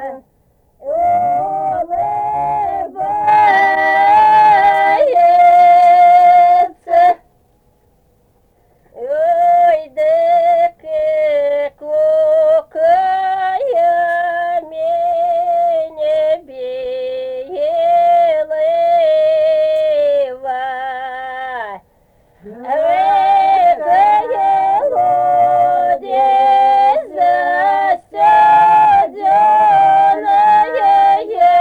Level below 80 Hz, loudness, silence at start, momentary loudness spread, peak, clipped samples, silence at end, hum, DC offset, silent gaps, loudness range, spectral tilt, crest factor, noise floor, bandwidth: -54 dBFS; -12 LUFS; 0 s; 12 LU; -2 dBFS; under 0.1%; 0 s; none; under 0.1%; none; 7 LU; -4.5 dB/octave; 10 dB; -55 dBFS; 8.8 kHz